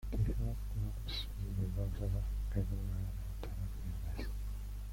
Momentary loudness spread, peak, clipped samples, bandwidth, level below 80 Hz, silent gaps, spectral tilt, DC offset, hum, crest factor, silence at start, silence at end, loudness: 6 LU; -22 dBFS; under 0.1%; 16.5 kHz; -40 dBFS; none; -6.5 dB/octave; under 0.1%; 50 Hz at -40 dBFS; 14 dB; 0 s; 0 s; -41 LUFS